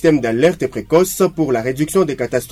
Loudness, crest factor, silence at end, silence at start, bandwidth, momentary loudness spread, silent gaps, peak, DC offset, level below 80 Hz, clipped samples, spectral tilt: -16 LUFS; 14 dB; 0 s; 0 s; 16 kHz; 4 LU; none; -2 dBFS; under 0.1%; -44 dBFS; under 0.1%; -5.5 dB/octave